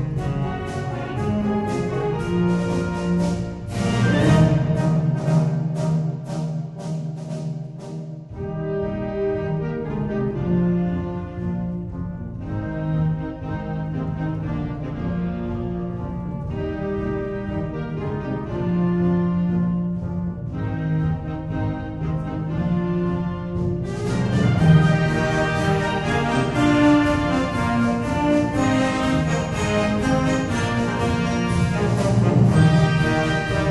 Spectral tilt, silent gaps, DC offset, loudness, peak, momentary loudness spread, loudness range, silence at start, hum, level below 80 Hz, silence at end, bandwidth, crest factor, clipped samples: -7 dB/octave; none; under 0.1%; -22 LUFS; -4 dBFS; 12 LU; 8 LU; 0 s; none; -38 dBFS; 0 s; 11.5 kHz; 18 dB; under 0.1%